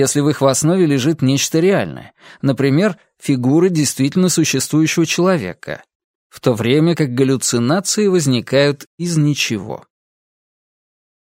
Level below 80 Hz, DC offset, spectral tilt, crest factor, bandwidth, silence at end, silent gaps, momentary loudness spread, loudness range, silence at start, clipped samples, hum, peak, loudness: -58 dBFS; under 0.1%; -5 dB/octave; 16 dB; 16.5 kHz; 1.5 s; 5.95-6.30 s, 8.86-8.98 s; 10 LU; 2 LU; 0 s; under 0.1%; none; 0 dBFS; -15 LUFS